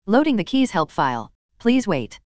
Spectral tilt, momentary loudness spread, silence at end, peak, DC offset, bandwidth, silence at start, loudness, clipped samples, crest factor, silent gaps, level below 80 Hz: -6 dB/octave; 7 LU; 0.15 s; -4 dBFS; 1%; 9.2 kHz; 0 s; -21 LUFS; under 0.1%; 18 dB; 1.35-1.49 s; -54 dBFS